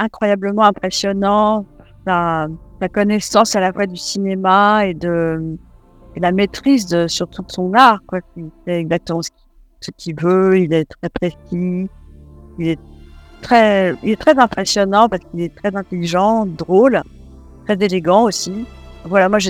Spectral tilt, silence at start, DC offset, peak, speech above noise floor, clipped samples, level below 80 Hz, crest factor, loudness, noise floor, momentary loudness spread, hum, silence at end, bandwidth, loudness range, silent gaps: -5 dB/octave; 0 s; under 0.1%; 0 dBFS; 24 dB; 0.1%; -44 dBFS; 16 dB; -16 LUFS; -40 dBFS; 15 LU; none; 0 s; 16 kHz; 4 LU; none